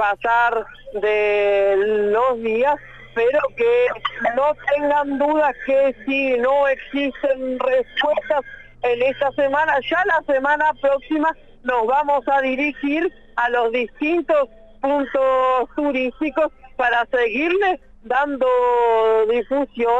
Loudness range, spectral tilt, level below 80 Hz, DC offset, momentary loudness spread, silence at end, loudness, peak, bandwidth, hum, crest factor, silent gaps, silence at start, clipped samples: 2 LU; -5 dB/octave; -50 dBFS; under 0.1%; 6 LU; 0 s; -19 LUFS; -6 dBFS; 7.8 kHz; none; 12 dB; none; 0 s; under 0.1%